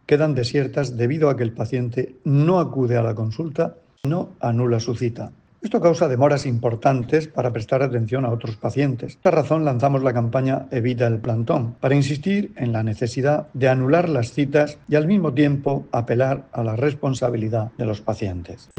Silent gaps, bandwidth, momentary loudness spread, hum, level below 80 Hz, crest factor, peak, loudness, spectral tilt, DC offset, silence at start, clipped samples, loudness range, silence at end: none; 9 kHz; 8 LU; none; -54 dBFS; 16 dB; -4 dBFS; -21 LUFS; -7.5 dB/octave; under 0.1%; 0.1 s; under 0.1%; 2 LU; 0.2 s